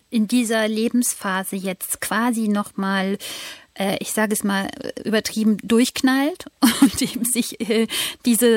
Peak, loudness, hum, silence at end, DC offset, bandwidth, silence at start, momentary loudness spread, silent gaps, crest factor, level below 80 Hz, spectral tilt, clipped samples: -2 dBFS; -21 LUFS; none; 0 s; under 0.1%; 16.5 kHz; 0.1 s; 9 LU; none; 18 dB; -56 dBFS; -3.5 dB/octave; under 0.1%